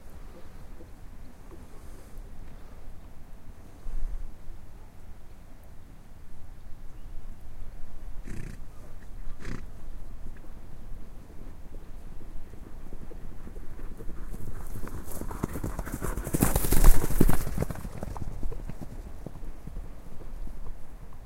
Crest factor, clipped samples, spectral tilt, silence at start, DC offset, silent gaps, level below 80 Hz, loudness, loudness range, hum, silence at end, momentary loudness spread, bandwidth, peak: 26 dB; under 0.1%; -5.5 dB/octave; 0 s; under 0.1%; none; -32 dBFS; -35 LUFS; 20 LU; none; 0 s; 23 LU; 16 kHz; -2 dBFS